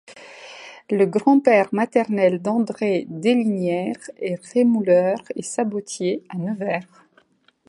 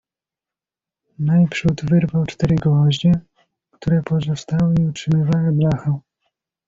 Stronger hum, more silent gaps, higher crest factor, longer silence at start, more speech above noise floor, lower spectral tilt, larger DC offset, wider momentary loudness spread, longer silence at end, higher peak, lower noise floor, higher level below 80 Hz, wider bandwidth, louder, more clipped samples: neither; neither; first, 20 dB vs 14 dB; second, 0.1 s vs 1.2 s; second, 39 dB vs 72 dB; second, -6 dB/octave vs -7.5 dB/octave; neither; first, 13 LU vs 6 LU; first, 0.85 s vs 0.7 s; about the same, -2 dBFS vs -4 dBFS; second, -59 dBFS vs -89 dBFS; second, -72 dBFS vs -46 dBFS; first, 11 kHz vs 7.6 kHz; second, -21 LUFS vs -18 LUFS; neither